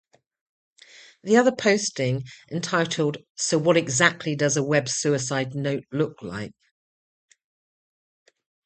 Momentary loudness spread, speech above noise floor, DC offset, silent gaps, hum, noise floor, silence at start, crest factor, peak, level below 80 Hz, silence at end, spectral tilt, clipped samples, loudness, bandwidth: 13 LU; 27 dB; under 0.1%; 3.30-3.35 s; none; -51 dBFS; 1.25 s; 24 dB; -2 dBFS; -64 dBFS; 2.15 s; -4 dB/octave; under 0.1%; -23 LUFS; 9 kHz